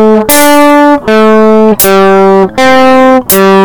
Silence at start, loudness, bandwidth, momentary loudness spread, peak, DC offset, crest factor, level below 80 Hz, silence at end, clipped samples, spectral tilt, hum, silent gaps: 0 s; -4 LUFS; over 20 kHz; 2 LU; 0 dBFS; 9%; 4 dB; -36 dBFS; 0 s; 10%; -4 dB/octave; none; none